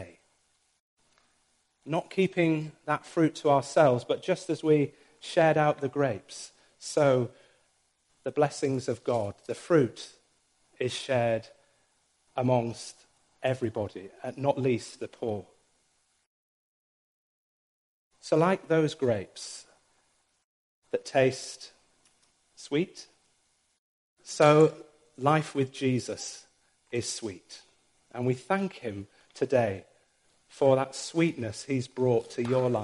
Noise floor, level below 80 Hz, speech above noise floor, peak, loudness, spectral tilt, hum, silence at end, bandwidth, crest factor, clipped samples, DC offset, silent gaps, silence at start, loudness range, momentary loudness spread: -72 dBFS; -72 dBFS; 44 dB; -6 dBFS; -28 LUFS; -6 dB/octave; none; 0 s; 11.5 kHz; 24 dB; under 0.1%; under 0.1%; 0.80-0.97 s, 16.26-18.11 s, 20.44-20.82 s, 23.78-24.16 s; 0 s; 7 LU; 18 LU